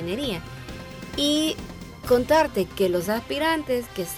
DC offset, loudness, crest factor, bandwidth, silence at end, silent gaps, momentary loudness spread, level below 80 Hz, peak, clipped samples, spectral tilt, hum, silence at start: under 0.1%; -24 LUFS; 16 dB; over 20 kHz; 0 s; none; 17 LU; -46 dBFS; -10 dBFS; under 0.1%; -4 dB/octave; none; 0 s